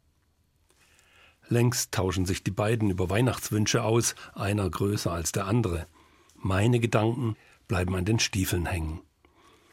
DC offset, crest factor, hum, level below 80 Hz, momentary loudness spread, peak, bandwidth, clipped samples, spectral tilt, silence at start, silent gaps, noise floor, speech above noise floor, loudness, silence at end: under 0.1%; 20 dB; none; -50 dBFS; 9 LU; -8 dBFS; 16.5 kHz; under 0.1%; -5 dB/octave; 1.5 s; none; -68 dBFS; 42 dB; -27 LUFS; 0.7 s